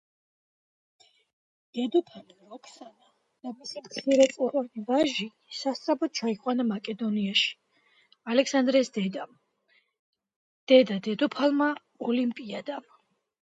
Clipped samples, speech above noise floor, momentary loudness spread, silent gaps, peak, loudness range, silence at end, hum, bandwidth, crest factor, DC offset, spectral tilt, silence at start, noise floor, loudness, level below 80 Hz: under 0.1%; 42 dB; 18 LU; 9.99-10.13 s, 10.36-10.67 s; -6 dBFS; 9 LU; 0.7 s; none; 9.2 kHz; 22 dB; under 0.1%; -4.5 dB/octave; 1.75 s; -69 dBFS; -27 LUFS; -78 dBFS